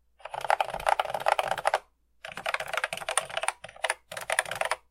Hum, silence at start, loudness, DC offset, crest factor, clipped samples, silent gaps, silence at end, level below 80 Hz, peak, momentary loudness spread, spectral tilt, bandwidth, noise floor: none; 0.25 s; -30 LUFS; under 0.1%; 26 dB; under 0.1%; none; 0.15 s; -60 dBFS; -4 dBFS; 8 LU; 0 dB/octave; 16.5 kHz; -50 dBFS